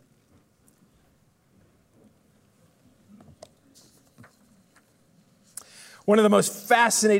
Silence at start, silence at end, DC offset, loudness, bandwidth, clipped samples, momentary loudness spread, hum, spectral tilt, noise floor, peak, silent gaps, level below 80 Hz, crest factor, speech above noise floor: 6.05 s; 0 s; under 0.1%; -21 LUFS; 16 kHz; under 0.1%; 25 LU; none; -3.5 dB/octave; -63 dBFS; -6 dBFS; none; -76 dBFS; 22 dB; 44 dB